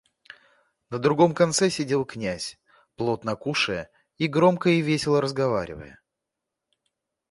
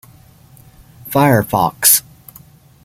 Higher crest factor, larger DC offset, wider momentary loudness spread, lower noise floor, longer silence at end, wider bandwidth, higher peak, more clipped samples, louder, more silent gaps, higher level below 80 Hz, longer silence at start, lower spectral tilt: about the same, 20 dB vs 18 dB; neither; first, 14 LU vs 7 LU; first, -85 dBFS vs -45 dBFS; first, 1.4 s vs 0.85 s; second, 11.5 kHz vs 17 kHz; second, -4 dBFS vs 0 dBFS; neither; second, -24 LUFS vs -13 LUFS; neither; second, -58 dBFS vs -48 dBFS; second, 0.9 s vs 1.05 s; first, -5 dB/octave vs -3.5 dB/octave